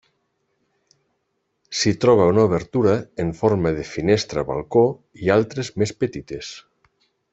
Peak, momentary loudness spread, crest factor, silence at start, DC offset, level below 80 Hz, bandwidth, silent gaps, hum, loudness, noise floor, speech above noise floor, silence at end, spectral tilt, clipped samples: -2 dBFS; 13 LU; 18 dB; 1.7 s; under 0.1%; -50 dBFS; 8.2 kHz; none; none; -20 LUFS; -73 dBFS; 53 dB; 0.75 s; -6 dB/octave; under 0.1%